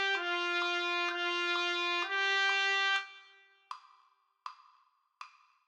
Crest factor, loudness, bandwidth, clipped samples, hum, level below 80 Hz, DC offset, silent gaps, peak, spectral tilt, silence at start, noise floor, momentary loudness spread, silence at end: 16 dB; -30 LUFS; 10.5 kHz; under 0.1%; none; under -90 dBFS; under 0.1%; none; -18 dBFS; 1.5 dB/octave; 0 s; -71 dBFS; 22 LU; 0.4 s